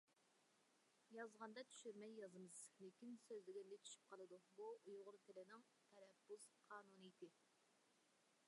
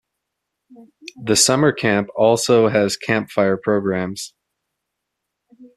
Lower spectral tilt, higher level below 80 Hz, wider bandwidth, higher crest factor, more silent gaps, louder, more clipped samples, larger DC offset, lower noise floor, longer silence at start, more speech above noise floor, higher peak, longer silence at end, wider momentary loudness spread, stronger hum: about the same, -3.5 dB/octave vs -4 dB/octave; second, under -90 dBFS vs -58 dBFS; second, 11 kHz vs 14 kHz; about the same, 20 dB vs 18 dB; neither; second, -61 LUFS vs -17 LUFS; neither; neither; about the same, -82 dBFS vs -79 dBFS; second, 0.1 s vs 0.8 s; second, 21 dB vs 61 dB; second, -42 dBFS vs -2 dBFS; about the same, 0 s vs 0.1 s; second, 7 LU vs 12 LU; neither